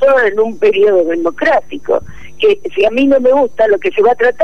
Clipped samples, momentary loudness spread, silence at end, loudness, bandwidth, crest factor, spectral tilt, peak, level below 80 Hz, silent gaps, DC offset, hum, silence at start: under 0.1%; 6 LU; 0 s; -12 LUFS; 6.8 kHz; 8 dB; -5.5 dB/octave; -2 dBFS; -46 dBFS; none; 5%; none; 0 s